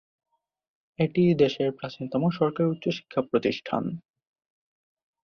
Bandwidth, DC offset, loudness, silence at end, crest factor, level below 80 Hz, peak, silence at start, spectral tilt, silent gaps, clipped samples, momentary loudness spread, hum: 6.8 kHz; under 0.1%; -26 LUFS; 1.25 s; 20 dB; -64 dBFS; -8 dBFS; 1 s; -8 dB/octave; none; under 0.1%; 9 LU; none